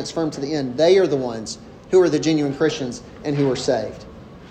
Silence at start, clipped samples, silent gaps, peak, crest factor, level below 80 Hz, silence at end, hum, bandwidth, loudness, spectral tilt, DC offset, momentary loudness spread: 0 s; under 0.1%; none; -6 dBFS; 16 dB; -52 dBFS; 0 s; none; 9.2 kHz; -20 LUFS; -5.5 dB/octave; under 0.1%; 16 LU